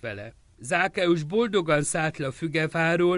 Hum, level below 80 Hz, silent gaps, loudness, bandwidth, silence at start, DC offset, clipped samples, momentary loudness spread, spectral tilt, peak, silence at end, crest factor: none; -58 dBFS; none; -25 LUFS; 11.5 kHz; 0.05 s; under 0.1%; under 0.1%; 14 LU; -5 dB/octave; -10 dBFS; 0 s; 16 dB